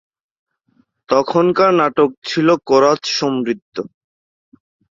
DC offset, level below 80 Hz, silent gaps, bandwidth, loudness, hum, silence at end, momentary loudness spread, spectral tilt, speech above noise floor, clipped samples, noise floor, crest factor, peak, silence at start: under 0.1%; -60 dBFS; 2.18-2.22 s, 3.62-3.72 s; 7.6 kHz; -15 LUFS; none; 1.1 s; 12 LU; -5 dB/octave; 45 dB; under 0.1%; -60 dBFS; 16 dB; -2 dBFS; 1.1 s